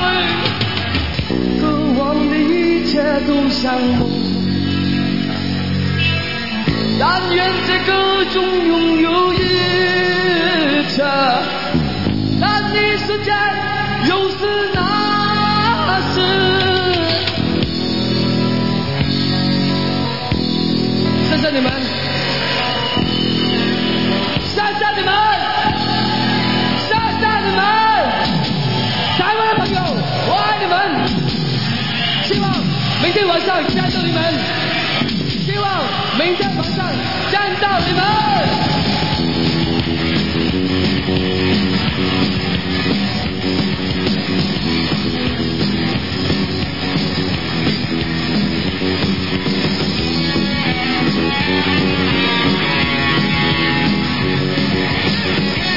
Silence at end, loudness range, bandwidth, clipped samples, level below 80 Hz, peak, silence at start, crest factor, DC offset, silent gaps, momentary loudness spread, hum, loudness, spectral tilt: 0 s; 3 LU; 5.8 kHz; under 0.1%; -38 dBFS; -2 dBFS; 0 s; 14 dB; 2%; none; 4 LU; none; -16 LUFS; -6 dB/octave